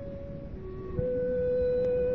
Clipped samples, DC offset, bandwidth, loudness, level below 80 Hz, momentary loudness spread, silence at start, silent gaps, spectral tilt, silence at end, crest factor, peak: under 0.1%; 0.3%; 4.3 kHz; -30 LUFS; -44 dBFS; 14 LU; 0 s; none; -9 dB/octave; 0 s; 14 dB; -16 dBFS